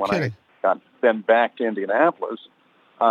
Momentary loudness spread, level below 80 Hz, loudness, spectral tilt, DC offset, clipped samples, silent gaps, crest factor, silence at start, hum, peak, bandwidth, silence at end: 12 LU; -66 dBFS; -22 LUFS; -7 dB/octave; under 0.1%; under 0.1%; none; 18 dB; 0 s; none; -4 dBFS; 9.2 kHz; 0 s